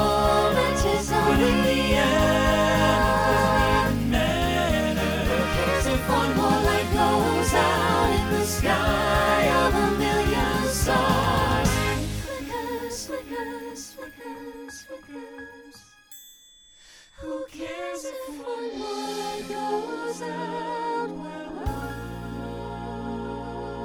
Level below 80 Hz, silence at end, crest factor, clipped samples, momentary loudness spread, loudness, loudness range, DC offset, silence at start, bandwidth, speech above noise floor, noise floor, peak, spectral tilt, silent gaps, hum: -36 dBFS; 0 s; 16 dB; under 0.1%; 16 LU; -23 LUFS; 17 LU; under 0.1%; 0 s; 19.5 kHz; 27 dB; -53 dBFS; -8 dBFS; -4.5 dB/octave; none; none